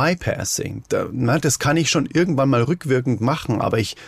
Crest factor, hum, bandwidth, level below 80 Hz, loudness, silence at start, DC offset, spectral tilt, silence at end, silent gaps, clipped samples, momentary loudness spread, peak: 12 dB; none; 15.5 kHz; -48 dBFS; -20 LUFS; 0 s; under 0.1%; -5 dB/octave; 0 s; none; under 0.1%; 6 LU; -8 dBFS